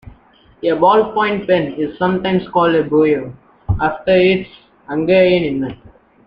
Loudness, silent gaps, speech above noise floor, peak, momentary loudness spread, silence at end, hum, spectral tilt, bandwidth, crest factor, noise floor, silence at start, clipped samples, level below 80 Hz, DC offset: -15 LUFS; none; 32 dB; 0 dBFS; 11 LU; 0.5 s; none; -9.5 dB/octave; 5.4 kHz; 16 dB; -47 dBFS; 0.05 s; under 0.1%; -40 dBFS; under 0.1%